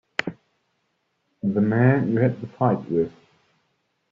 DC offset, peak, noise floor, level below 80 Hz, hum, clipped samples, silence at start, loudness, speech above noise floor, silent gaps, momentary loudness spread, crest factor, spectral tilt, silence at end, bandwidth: under 0.1%; -4 dBFS; -73 dBFS; -62 dBFS; none; under 0.1%; 0.2 s; -23 LUFS; 52 dB; none; 11 LU; 22 dB; -7 dB/octave; 1 s; 7.2 kHz